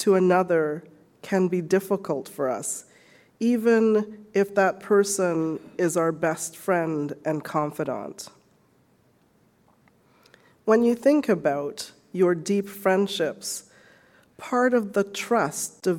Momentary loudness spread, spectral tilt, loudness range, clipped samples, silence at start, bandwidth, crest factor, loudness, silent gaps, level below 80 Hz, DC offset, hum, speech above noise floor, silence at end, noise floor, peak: 12 LU; -5 dB/octave; 7 LU; under 0.1%; 0 s; 17.5 kHz; 18 dB; -24 LUFS; none; -72 dBFS; under 0.1%; none; 39 dB; 0 s; -62 dBFS; -6 dBFS